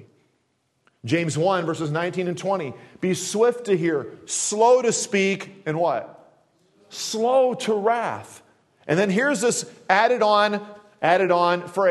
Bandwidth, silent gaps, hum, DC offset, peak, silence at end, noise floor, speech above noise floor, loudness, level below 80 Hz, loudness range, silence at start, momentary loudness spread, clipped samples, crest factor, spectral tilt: 12.5 kHz; none; none; under 0.1%; -2 dBFS; 0 s; -70 dBFS; 48 dB; -22 LUFS; -70 dBFS; 4 LU; 1.05 s; 11 LU; under 0.1%; 20 dB; -4 dB/octave